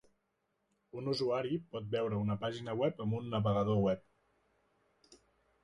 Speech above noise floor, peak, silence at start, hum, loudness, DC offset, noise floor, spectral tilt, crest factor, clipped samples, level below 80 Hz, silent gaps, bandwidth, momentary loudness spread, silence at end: 47 dB; -20 dBFS; 0.95 s; none; -35 LUFS; under 0.1%; -81 dBFS; -7.5 dB/octave; 16 dB; under 0.1%; -64 dBFS; none; 10.5 kHz; 8 LU; 0.5 s